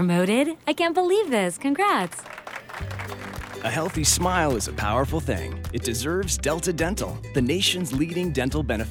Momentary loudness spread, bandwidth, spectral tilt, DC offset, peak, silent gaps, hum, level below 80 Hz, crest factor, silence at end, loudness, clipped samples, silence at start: 13 LU; 19 kHz; -4 dB/octave; under 0.1%; -8 dBFS; none; none; -38 dBFS; 16 dB; 0 s; -24 LUFS; under 0.1%; 0 s